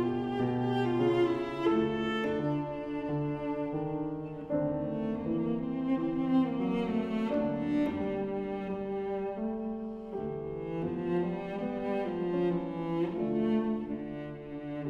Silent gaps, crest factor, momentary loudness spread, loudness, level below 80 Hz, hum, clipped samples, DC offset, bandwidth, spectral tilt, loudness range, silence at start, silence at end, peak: none; 16 dB; 8 LU; -32 LUFS; -58 dBFS; none; under 0.1%; under 0.1%; 7.6 kHz; -8.5 dB/octave; 4 LU; 0 s; 0 s; -16 dBFS